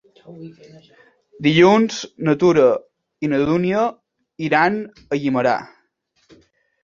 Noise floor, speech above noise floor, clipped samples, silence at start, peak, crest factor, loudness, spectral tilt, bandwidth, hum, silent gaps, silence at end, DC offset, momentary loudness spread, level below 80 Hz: -65 dBFS; 47 dB; under 0.1%; 0.25 s; -2 dBFS; 18 dB; -18 LUFS; -6 dB/octave; 7.4 kHz; none; none; 1.2 s; under 0.1%; 15 LU; -56 dBFS